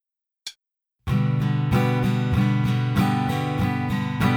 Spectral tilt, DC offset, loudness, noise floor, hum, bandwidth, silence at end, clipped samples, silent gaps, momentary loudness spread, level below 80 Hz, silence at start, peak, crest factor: -7.5 dB/octave; under 0.1%; -22 LUFS; -78 dBFS; none; 17.5 kHz; 0 s; under 0.1%; none; 16 LU; -42 dBFS; 0.45 s; -8 dBFS; 14 dB